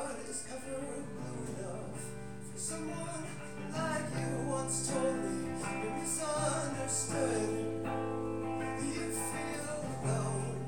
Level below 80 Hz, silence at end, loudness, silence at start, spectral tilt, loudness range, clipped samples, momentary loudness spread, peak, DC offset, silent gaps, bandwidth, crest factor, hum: -60 dBFS; 0 s; -37 LUFS; 0 s; -4.5 dB/octave; 7 LU; under 0.1%; 9 LU; -20 dBFS; 0.4%; none; 19 kHz; 16 dB; none